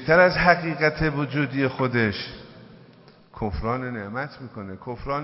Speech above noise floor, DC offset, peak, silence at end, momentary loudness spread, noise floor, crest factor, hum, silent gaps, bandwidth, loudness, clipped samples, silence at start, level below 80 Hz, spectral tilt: 28 dB; under 0.1%; -2 dBFS; 0 s; 19 LU; -51 dBFS; 22 dB; none; none; 5.8 kHz; -23 LUFS; under 0.1%; 0 s; -42 dBFS; -10 dB/octave